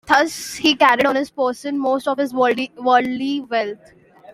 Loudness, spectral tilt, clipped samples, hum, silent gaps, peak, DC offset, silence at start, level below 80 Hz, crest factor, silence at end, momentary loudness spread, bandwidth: -18 LUFS; -3 dB/octave; under 0.1%; none; none; 0 dBFS; under 0.1%; 0.05 s; -60 dBFS; 18 dB; 0 s; 9 LU; 16 kHz